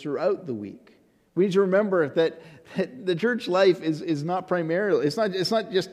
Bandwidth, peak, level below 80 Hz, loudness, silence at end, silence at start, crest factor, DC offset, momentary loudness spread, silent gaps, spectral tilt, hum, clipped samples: 13.5 kHz; -8 dBFS; -72 dBFS; -24 LUFS; 0 s; 0 s; 16 dB; under 0.1%; 10 LU; none; -6 dB/octave; none; under 0.1%